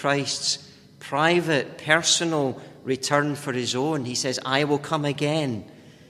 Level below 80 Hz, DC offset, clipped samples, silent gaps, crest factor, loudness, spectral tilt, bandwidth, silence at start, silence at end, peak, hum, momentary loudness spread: -64 dBFS; under 0.1%; under 0.1%; none; 22 dB; -24 LUFS; -3.5 dB/octave; 15 kHz; 0 s; 0.2 s; -2 dBFS; none; 10 LU